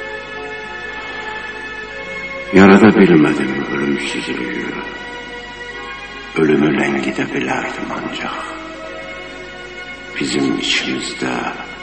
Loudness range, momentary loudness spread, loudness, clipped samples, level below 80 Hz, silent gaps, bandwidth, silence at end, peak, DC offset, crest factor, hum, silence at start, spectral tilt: 9 LU; 18 LU; -16 LUFS; under 0.1%; -46 dBFS; none; 8.8 kHz; 0 s; 0 dBFS; 0.1%; 18 dB; none; 0 s; -5.5 dB/octave